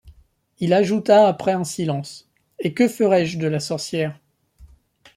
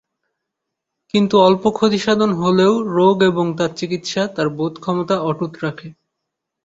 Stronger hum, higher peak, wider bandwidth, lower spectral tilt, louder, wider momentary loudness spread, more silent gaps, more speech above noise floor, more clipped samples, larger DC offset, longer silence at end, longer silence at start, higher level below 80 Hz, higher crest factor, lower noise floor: neither; about the same, -4 dBFS vs -2 dBFS; first, 14 kHz vs 8 kHz; about the same, -6 dB/octave vs -6 dB/octave; second, -20 LUFS vs -17 LUFS; first, 13 LU vs 10 LU; neither; second, 36 dB vs 63 dB; neither; neither; second, 0.5 s vs 0.75 s; second, 0.05 s vs 1.15 s; about the same, -56 dBFS vs -56 dBFS; about the same, 18 dB vs 16 dB; second, -55 dBFS vs -80 dBFS